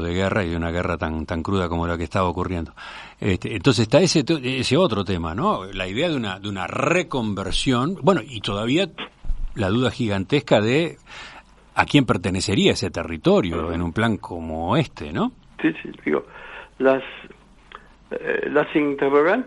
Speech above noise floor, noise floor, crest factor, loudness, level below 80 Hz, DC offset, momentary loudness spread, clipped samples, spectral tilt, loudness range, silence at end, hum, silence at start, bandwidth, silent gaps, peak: 24 dB; -45 dBFS; 22 dB; -22 LUFS; -40 dBFS; under 0.1%; 12 LU; under 0.1%; -5.5 dB/octave; 4 LU; 0 s; none; 0 s; 11.5 kHz; none; 0 dBFS